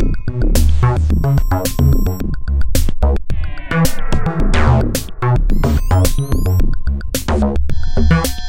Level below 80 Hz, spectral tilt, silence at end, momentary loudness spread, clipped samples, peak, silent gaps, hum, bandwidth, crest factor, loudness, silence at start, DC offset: -16 dBFS; -6 dB/octave; 0 s; 6 LU; under 0.1%; 0 dBFS; none; none; 16.5 kHz; 12 dB; -17 LUFS; 0 s; 5%